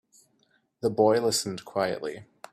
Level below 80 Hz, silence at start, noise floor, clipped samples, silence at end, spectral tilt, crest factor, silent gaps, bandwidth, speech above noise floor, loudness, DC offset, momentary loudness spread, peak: -68 dBFS; 0.85 s; -69 dBFS; under 0.1%; 0.3 s; -4 dB/octave; 20 dB; none; 15.5 kHz; 43 dB; -27 LUFS; under 0.1%; 14 LU; -8 dBFS